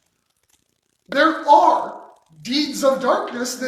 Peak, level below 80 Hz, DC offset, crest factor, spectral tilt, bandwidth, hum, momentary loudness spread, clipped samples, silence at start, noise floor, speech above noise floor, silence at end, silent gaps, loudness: 0 dBFS; -68 dBFS; under 0.1%; 20 dB; -2.5 dB/octave; 16 kHz; none; 12 LU; under 0.1%; 1.1 s; -68 dBFS; 51 dB; 0 s; none; -18 LUFS